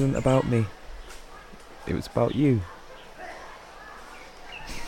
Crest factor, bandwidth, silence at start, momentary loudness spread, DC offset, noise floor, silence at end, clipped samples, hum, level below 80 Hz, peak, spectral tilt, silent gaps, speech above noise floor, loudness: 20 dB; 16 kHz; 0 s; 23 LU; under 0.1%; -45 dBFS; 0 s; under 0.1%; none; -46 dBFS; -8 dBFS; -7 dB/octave; none; 21 dB; -25 LUFS